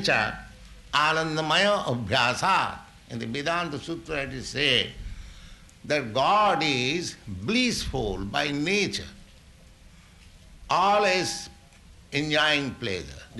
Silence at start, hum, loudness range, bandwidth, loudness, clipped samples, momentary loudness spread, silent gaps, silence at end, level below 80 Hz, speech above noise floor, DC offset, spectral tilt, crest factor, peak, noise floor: 0 s; none; 4 LU; 12 kHz; -25 LUFS; under 0.1%; 14 LU; none; 0 s; -48 dBFS; 26 dB; under 0.1%; -3.5 dB/octave; 18 dB; -8 dBFS; -51 dBFS